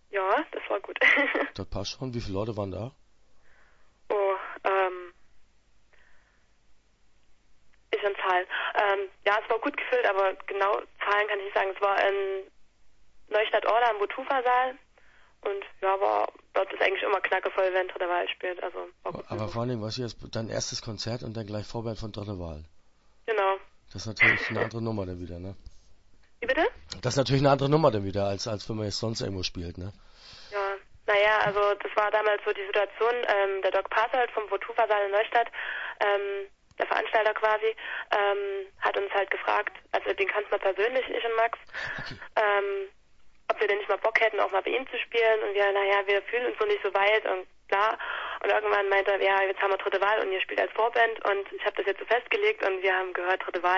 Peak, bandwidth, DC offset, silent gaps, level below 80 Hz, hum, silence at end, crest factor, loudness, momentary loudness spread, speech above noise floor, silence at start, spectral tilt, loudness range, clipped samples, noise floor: -8 dBFS; 8 kHz; under 0.1%; none; -56 dBFS; none; 0 s; 20 dB; -27 LUFS; 12 LU; 34 dB; 0.1 s; -4.5 dB/octave; 7 LU; under 0.1%; -62 dBFS